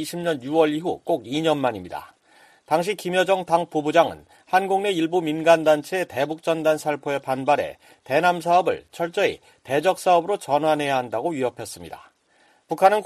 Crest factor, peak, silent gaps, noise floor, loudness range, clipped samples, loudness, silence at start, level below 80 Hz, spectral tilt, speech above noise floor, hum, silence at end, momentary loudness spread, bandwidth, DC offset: 18 dB; -4 dBFS; none; -60 dBFS; 3 LU; under 0.1%; -22 LUFS; 0 s; -64 dBFS; -5 dB/octave; 38 dB; none; 0 s; 9 LU; 14.5 kHz; under 0.1%